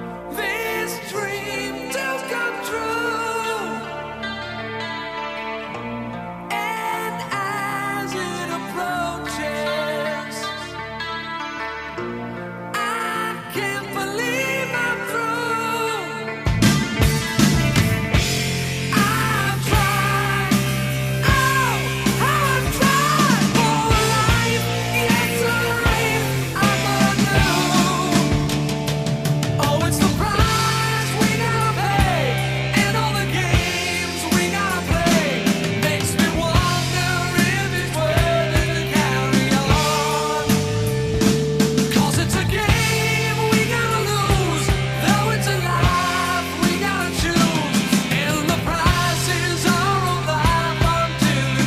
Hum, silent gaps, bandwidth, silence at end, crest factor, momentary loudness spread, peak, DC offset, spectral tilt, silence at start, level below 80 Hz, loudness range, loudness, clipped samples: none; none; 15.5 kHz; 0 s; 18 dB; 9 LU; -2 dBFS; under 0.1%; -4.5 dB/octave; 0 s; -34 dBFS; 8 LU; -20 LUFS; under 0.1%